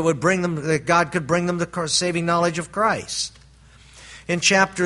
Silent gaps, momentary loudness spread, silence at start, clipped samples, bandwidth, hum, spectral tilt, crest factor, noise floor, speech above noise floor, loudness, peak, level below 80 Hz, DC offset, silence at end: none; 9 LU; 0 s; under 0.1%; 11.5 kHz; none; -3.5 dB/octave; 20 dB; -49 dBFS; 28 dB; -21 LUFS; -2 dBFS; -52 dBFS; under 0.1%; 0 s